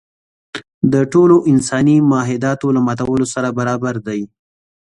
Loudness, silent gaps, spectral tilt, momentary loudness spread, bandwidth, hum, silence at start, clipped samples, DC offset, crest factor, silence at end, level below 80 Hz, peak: -15 LUFS; 0.74-0.81 s; -6.5 dB/octave; 15 LU; 11 kHz; none; 0.55 s; under 0.1%; under 0.1%; 14 dB; 0.6 s; -50 dBFS; 0 dBFS